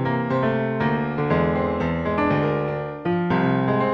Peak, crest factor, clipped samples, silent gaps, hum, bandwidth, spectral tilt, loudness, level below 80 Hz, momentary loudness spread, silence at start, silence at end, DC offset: -8 dBFS; 14 dB; under 0.1%; none; none; 6.2 kHz; -9.5 dB/octave; -22 LUFS; -44 dBFS; 4 LU; 0 s; 0 s; under 0.1%